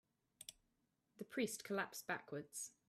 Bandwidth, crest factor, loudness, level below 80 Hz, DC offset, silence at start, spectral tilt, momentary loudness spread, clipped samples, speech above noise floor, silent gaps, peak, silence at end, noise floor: 15.5 kHz; 22 dB; -46 LUFS; -88 dBFS; under 0.1%; 0.4 s; -3 dB/octave; 14 LU; under 0.1%; 38 dB; none; -26 dBFS; 0.2 s; -85 dBFS